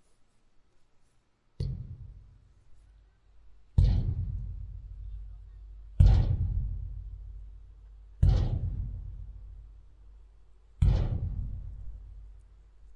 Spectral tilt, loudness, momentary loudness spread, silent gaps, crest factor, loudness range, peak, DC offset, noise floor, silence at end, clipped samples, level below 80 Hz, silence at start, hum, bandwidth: -9 dB/octave; -30 LUFS; 24 LU; none; 24 dB; 6 LU; -8 dBFS; under 0.1%; -67 dBFS; 0.05 s; under 0.1%; -34 dBFS; 1.6 s; none; 5.6 kHz